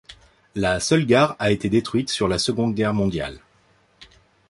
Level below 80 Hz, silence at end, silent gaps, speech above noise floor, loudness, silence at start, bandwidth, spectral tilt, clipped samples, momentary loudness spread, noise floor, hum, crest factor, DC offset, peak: -46 dBFS; 0.45 s; none; 39 dB; -21 LUFS; 0.1 s; 11.5 kHz; -5 dB/octave; under 0.1%; 8 LU; -59 dBFS; none; 20 dB; under 0.1%; -4 dBFS